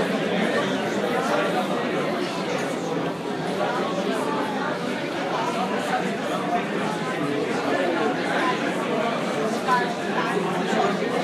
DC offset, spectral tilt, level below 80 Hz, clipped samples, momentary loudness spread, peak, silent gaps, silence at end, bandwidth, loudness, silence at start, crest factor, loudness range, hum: under 0.1%; -5 dB/octave; -68 dBFS; under 0.1%; 4 LU; -8 dBFS; none; 0 s; 15.5 kHz; -24 LUFS; 0 s; 16 dB; 2 LU; none